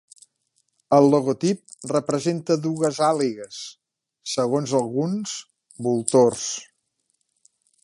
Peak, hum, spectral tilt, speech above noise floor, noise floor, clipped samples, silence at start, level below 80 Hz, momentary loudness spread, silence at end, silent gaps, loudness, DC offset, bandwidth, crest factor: -2 dBFS; none; -5.5 dB/octave; 52 dB; -73 dBFS; under 0.1%; 0.9 s; -68 dBFS; 16 LU; 1.2 s; none; -22 LUFS; under 0.1%; 11.5 kHz; 22 dB